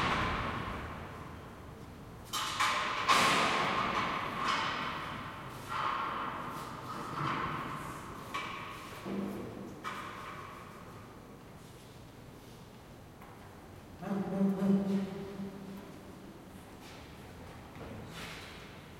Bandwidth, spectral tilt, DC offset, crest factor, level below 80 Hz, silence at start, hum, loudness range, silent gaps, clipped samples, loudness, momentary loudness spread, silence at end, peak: 16.5 kHz; -4 dB/octave; under 0.1%; 24 dB; -58 dBFS; 0 s; none; 16 LU; none; under 0.1%; -35 LUFS; 21 LU; 0 s; -14 dBFS